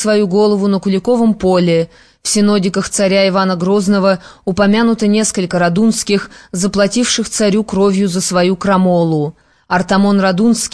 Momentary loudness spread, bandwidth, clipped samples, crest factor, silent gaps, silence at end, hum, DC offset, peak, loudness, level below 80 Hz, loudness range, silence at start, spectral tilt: 6 LU; 11 kHz; under 0.1%; 12 dB; none; 0.05 s; none; 0.4%; -2 dBFS; -13 LUFS; -44 dBFS; 1 LU; 0 s; -5 dB/octave